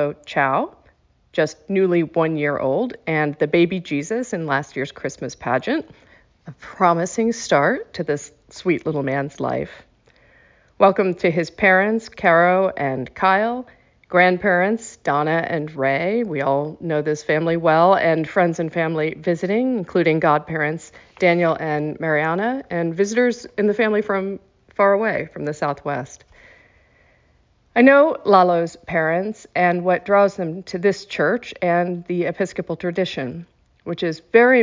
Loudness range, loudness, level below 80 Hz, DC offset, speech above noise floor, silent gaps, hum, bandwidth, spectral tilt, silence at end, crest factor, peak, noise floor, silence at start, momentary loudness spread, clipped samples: 5 LU; -20 LUFS; -58 dBFS; under 0.1%; 39 dB; none; none; 7.6 kHz; -6 dB/octave; 0 s; 18 dB; -2 dBFS; -59 dBFS; 0 s; 11 LU; under 0.1%